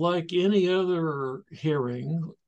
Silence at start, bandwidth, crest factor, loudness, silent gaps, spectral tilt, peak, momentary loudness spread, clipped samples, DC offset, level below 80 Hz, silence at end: 0 s; 8 kHz; 14 dB; -27 LUFS; none; -7.5 dB/octave; -12 dBFS; 9 LU; under 0.1%; under 0.1%; -74 dBFS; 0.15 s